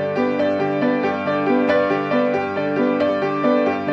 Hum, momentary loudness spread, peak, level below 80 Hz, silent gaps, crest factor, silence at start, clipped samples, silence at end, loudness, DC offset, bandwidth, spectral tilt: none; 3 LU; -4 dBFS; -62 dBFS; none; 14 dB; 0 s; under 0.1%; 0 s; -19 LUFS; under 0.1%; 6.8 kHz; -7.5 dB/octave